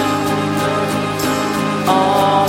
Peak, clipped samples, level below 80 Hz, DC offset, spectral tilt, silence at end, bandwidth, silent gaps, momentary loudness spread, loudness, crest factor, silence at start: -2 dBFS; under 0.1%; -48 dBFS; under 0.1%; -5 dB/octave; 0 s; 16.5 kHz; none; 5 LU; -16 LUFS; 14 dB; 0 s